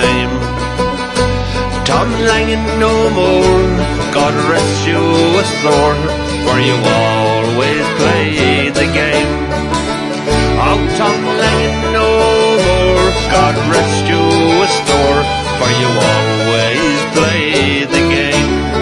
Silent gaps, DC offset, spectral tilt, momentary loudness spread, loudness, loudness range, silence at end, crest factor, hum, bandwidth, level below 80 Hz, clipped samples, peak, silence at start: none; under 0.1%; -4.5 dB/octave; 5 LU; -12 LUFS; 2 LU; 0 s; 12 dB; none; 11.5 kHz; -26 dBFS; under 0.1%; 0 dBFS; 0 s